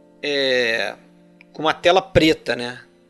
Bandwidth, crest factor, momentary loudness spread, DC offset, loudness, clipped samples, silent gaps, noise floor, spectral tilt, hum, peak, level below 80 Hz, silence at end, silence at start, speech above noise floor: 12.5 kHz; 20 dB; 10 LU; under 0.1%; -19 LUFS; under 0.1%; none; -49 dBFS; -4.5 dB/octave; none; 0 dBFS; -46 dBFS; 0.3 s; 0.25 s; 30 dB